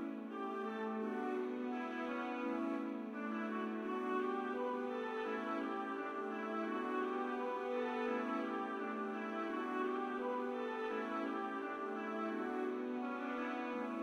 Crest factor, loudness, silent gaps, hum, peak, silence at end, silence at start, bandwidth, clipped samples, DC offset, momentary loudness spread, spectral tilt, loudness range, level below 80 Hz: 14 dB; -41 LUFS; none; none; -26 dBFS; 0 s; 0 s; 11 kHz; under 0.1%; under 0.1%; 3 LU; -6 dB/octave; 1 LU; -86 dBFS